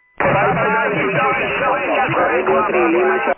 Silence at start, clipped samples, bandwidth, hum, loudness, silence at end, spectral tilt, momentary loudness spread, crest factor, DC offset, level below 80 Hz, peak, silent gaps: 0.2 s; under 0.1%; 3.3 kHz; none; -16 LUFS; 0.05 s; -9.5 dB/octave; 2 LU; 12 dB; under 0.1%; -46 dBFS; -4 dBFS; none